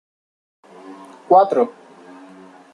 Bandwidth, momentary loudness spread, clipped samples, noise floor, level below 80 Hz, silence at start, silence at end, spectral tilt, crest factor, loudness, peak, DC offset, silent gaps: 10 kHz; 27 LU; under 0.1%; -43 dBFS; -74 dBFS; 0.85 s; 1.05 s; -7 dB/octave; 20 dB; -16 LUFS; -2 dBFS; under 0.1%; none